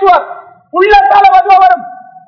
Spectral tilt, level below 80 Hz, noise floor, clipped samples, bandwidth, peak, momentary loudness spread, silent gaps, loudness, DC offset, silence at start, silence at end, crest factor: -4.5 dB/octave; -38 dBFS; -29 dBFS; 7%; 5.4 kHz; 0 dBFS; 11 LU; none; -7 LUFS; under 0.1%; 0 s; 0.3 s; 8 dB